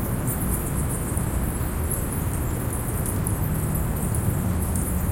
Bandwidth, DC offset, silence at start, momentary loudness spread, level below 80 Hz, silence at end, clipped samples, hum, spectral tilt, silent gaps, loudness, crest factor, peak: 17 kHz; under 0.1%; 0 s; 2 LU; -30 dBFS; 0 s; under 0.1%; none; -6 dB/octave; none; -26 LUFS; 16 dB; -10 dBFS